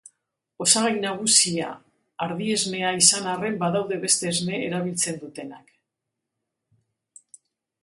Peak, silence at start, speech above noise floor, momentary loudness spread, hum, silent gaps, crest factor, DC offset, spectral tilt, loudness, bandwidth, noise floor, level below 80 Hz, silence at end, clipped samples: -2 dBFS; 0.6 s; 59 dB; 15 LU; none; none; 24 dB; under 0.1%; -2 dB/octave; -21 LUFS; 12 kHz; -83 dBFS; -70 dBFS; 2.25 s; under 0.1%